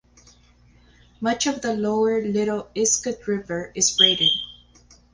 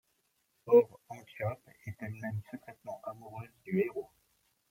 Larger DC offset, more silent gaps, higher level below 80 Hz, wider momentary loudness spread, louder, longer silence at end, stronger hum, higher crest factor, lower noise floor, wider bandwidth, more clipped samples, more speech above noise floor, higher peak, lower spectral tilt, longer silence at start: neither; neither; first, -56 dBFS vs -74 dBFS; second, 12 LU vs 23 LU; first, -21 LUFS vs -33 LUFS; about the same, 0.6 s vs 0.65 s; first, 60 Hz at -50 dBFS vs none; about the same, 20 dB vs 24 dB; second, -55 dBFS vs -77 dBFS; second, 10.5 kHz vs 16.5 kHz; neither; second, 33 dB vs 45 dB; first, -4 dBFS vs -12 dBFS; second, -2 dB/octave vs -8.5 dB/octave; first, 1.2 s vs 0.65 s